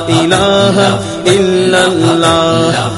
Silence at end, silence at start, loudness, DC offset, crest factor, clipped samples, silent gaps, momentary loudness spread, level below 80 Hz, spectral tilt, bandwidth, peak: 0 s; 0 s; -10 LUFS; under 0.1%; 10 dB; 0.2%; none; 3 LU; -40 dBFS; -4.5 dB/octave; 11.5 kHz; 0 dBFS